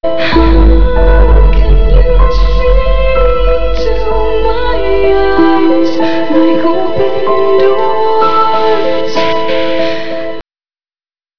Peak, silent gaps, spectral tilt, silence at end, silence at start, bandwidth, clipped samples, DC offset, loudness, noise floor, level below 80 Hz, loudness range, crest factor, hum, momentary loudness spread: 0 dBFS; none; -7.5 dB/octave; 0 s; 0 s; 5.4 kHz; under 0.1%; 20%; -11 LUFS; under -90 dBFS; -12 dBFS; 2 LU; 10 dB; none; 5 LU